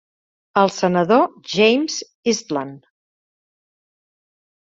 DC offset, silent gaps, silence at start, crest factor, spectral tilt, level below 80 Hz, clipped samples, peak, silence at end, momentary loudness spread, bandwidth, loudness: under 0.1%; 2.15-2.23 s; 0.55 s; 20 dB; -4.5 dB/octave; -64 dBFS; under 0.1%; -2 dBFS; 1.9 s; 10 LU; 7.8 kHz; -18 LUFS